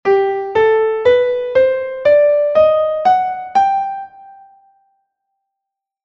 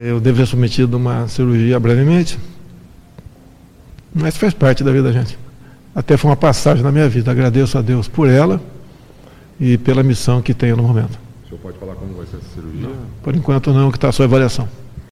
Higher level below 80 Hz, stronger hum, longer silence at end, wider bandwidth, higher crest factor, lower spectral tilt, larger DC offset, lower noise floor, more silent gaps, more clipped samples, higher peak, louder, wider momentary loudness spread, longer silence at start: second, -54 dBFS vs -36 dBFS; neither; first, 1.75 s vs 0.1 s; second, 7 kHz vs 12.5 kHz; about the same, 14 dB vs 14 dB; second, -5.5 dB/octave vs -7.5 dB/octave; neither; first, -82 dBFS vs -43 dBFS; neither; neither; about the same, -2 dBFS vs 0 dBFS; about the same, -14 LUFS vs -14 LUFS; second, 5 LU vs 17 LU; about the same, 0.05 s vs 0 s